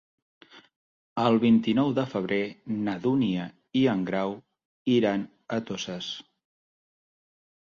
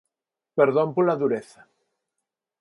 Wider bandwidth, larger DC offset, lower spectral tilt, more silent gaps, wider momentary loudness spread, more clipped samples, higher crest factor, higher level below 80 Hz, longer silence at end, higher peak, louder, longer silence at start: second, 7 kHz vs 11.5 kHz; neither; second, -6.5 dB/octave vs -8 dB/octave; first, 0.76-1.16 s, 4.65-4.85 s vs none; about the same, 12 LU vs 10 LU; neither; about the same, 20 dB vs 20 dB; first, -66 dBFS vs -76 dBFS; first, 1.5 s vs 1.2 s; about the same, -8 dBFS vs -6 dBFS; second, -27 LUFS vs -23 LUFS; about the same, 0.55 s vs 0.55 s